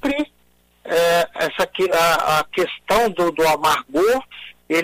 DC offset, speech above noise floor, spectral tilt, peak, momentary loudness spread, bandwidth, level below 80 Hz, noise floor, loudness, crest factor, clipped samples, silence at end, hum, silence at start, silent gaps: under 0.1%; 40 dB; -3.5 dB/octave; -6 dBFS; 7 LU; 16 kHz; -48 dBFS; -58 dBFS; -19 LUFS; 12 dB; under 0.1%; 0 s; 60 Hz at -60 dBFS; 0.05 s; none